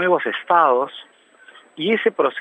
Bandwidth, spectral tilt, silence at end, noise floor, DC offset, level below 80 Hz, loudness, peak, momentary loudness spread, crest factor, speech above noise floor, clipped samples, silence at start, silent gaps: 8.4 kHz; -6.5 dB/octave; 0 s; -48 dBFS; under 0.1%; -80 dBFS; -19 LUFS; -2 dBFS; 12 LU; 18 dB; 30 dB; under 0.1%; 0 s; none